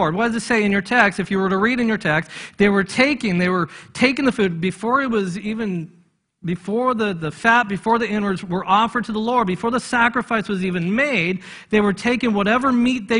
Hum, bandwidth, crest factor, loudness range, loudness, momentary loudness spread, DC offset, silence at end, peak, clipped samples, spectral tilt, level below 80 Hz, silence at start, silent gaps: none; 11 kHz; 20 dB; 3 LU; -19 LUFS; 8 LU; under 0.1%; 0 s; 0 dBFS; under 0.1%; -5.5 dB/octave; -52 dBFS; 0 s; none